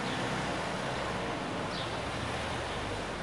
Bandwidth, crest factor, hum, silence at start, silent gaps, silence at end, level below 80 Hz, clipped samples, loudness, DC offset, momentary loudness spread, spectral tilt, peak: 11.5 kHz; 12 dB; none; 0 s; none; 0 s; -50 dBFS; under 0.1%; -34 LUFS; 0.1%; 2 LU; -4.5 dB/octave; -22 dBFS